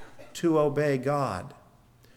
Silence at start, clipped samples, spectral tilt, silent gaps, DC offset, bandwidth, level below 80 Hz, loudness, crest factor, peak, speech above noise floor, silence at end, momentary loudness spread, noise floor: 0 s; under 0.1%; -6.5 dB/octave; none; under 0.1%; 16.5 kHz; -62 dBFS; -27 LUFS; 14 dB; -14 dBFS; 31 dB; 0.65 s; 16 LU; -57 dBFS